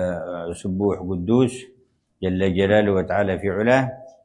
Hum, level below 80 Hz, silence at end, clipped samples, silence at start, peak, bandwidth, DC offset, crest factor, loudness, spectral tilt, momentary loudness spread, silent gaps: none; -54 dBFS; 0.15 s; under 0.1%; 0 s; -4 dBFS; 11 kHz; under 0.1%; 18 dB; -21 LUFS; -7 dB/octave; 11 LU; none